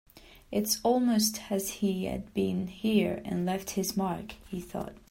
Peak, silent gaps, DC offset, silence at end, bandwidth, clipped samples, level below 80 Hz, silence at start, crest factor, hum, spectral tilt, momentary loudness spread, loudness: -14 dBFS; none; under 0.1%; 0.15 s; 16 kHz; under 0.1%; -56 dBFS; 0.15 s; 16 dB; none; -4.5 dB/octave; 13 LU; -30 LUFS